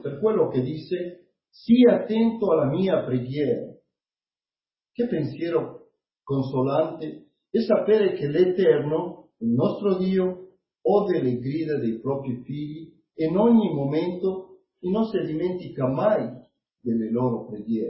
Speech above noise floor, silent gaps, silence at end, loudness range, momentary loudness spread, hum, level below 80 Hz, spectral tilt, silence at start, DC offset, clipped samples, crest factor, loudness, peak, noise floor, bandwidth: over 67 dB; none; 0 s; 6 LU; 14 LU; none; -62 dBFS; -12 dB/octave; 0.05 s; under 0.1%; under 0.1%; 18 dB; -24 LUFS; -6 dBFS; under -90 dBFS; 5.8 kHz